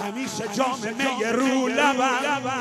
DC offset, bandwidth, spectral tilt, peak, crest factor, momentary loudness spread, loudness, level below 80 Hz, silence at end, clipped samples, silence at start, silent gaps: under 0.1%; 14.5 kHz; -3 dB/octave; -8 dBFS; 16 dB; 7 LU; -23 LUFS; -70 dBFS; 0 s; under 0.1%; 0 s; none